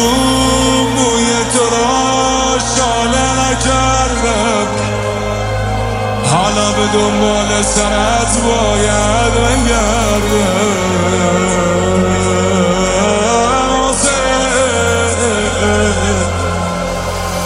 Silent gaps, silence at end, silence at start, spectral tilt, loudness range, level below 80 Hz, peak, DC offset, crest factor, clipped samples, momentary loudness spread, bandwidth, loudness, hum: none; 0 s; 0 s; -4 dB/octave; 2 LU; -24 dBFS; 0 dBFS; under 0.1%; 12 dB; under 0.1%; 5 LU; 16 kHz; -12 LUFS; none